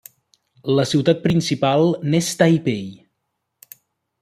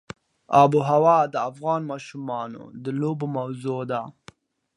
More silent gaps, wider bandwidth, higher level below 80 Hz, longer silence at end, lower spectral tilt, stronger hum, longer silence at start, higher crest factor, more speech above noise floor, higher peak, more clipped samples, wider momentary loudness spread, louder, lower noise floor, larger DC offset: neither; first, 15 kHz vs 11 kHz; first, -58 dBFS vs -68 dBFS; first, 1.25 s vs 0.65 s; second, -5.5 dB/octave vs -7.5 dB/octave; neither; first, 0.65 s vs 0.5 s; about the same, 18 dB vs 20 dB; first, 58 dB vs 29 dB; about the same, -2 dBFS vs -4 dBFS; neither; second, 10 LU vs 17 LU; first, -18 LUFS vs -23 LUFS; first, -76 dBFS vs -52 dBFS; neither